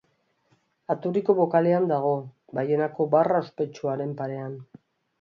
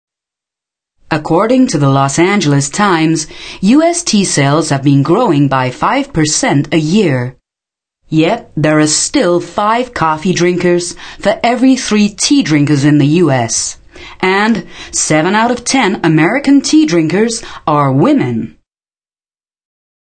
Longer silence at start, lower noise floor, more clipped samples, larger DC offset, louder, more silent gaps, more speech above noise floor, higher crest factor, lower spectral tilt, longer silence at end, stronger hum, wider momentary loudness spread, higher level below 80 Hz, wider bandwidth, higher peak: second, 0.9 s vs 1.1 s; second, -70 dBFS vs under -90 dBFS; neither; second, under 0.1% vs 0.3%; second, -25 LUFS vs -11 LUFS; neither; second, 45 dB vs over 79 dB; first, 18 dB vs 12 dB; first, -9 dB/octave vs -4.5 dB/octave; second, 0.55 s vs 1.65 s; neither; first, 13 LU vs 7 LU; second, -74 dBFS vs -44 dBFS; second, 7 kHz vs 9.6 kHz; second, -6 dBFS vs 0 dBFS